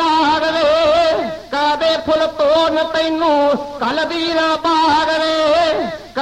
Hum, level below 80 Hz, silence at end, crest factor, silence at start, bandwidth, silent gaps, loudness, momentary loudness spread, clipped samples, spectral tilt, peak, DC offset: none; -46 dBFS; 0 s; 12 dB; 0 s; 11.5 kHz; none; -15 LUFS; 5 LU; under 0.1%; -3.5 dB/octave; -4 dBFS; 0.1%